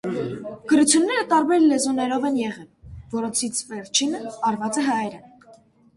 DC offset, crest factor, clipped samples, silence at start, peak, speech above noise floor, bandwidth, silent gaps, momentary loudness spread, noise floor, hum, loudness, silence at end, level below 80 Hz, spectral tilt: under 0.1%; 20 dB; under 0.1%; 0.05 s; -2 dBFS; 31 dB; 11.5 kHz; none; 13 LU; -52 dBFS; none; -22 LUFS; 0.7 s; -56 dBFS; -3 dB/octave